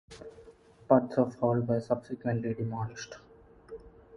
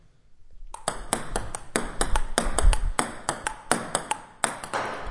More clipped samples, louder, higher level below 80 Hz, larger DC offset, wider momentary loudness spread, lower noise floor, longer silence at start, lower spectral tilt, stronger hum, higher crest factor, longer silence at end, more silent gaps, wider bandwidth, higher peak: neither; about the same, -30 LUFS vs -29 LUFS; second, -62 dBFS vs -30 dBFS; neither; first, 23 LU vs 8 LU; first, -55 dBFS vs -49 dBFS; second, 0.1 s vs 0.3 s; first, -8 dB/octave vs -3 dB/octave; neither; about the same, 24 dB vs 24 dB; about the same, 0 s vs 0 s; neither; about the same, 10.5 kHz vs 11.5 kHz; second, -8 dBFS vs -2 dBFS